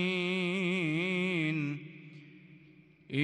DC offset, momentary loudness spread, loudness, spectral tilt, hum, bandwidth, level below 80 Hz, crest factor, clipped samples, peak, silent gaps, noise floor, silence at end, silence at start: under 0.1%; 20 LU; -32 LUFS; -6.5 dB/octave; none; 10.5 kHz; -80 dBFS; 16 dB; under 0.1%; -18 dBFS; none; -59 dBFS; 0 s; 0 s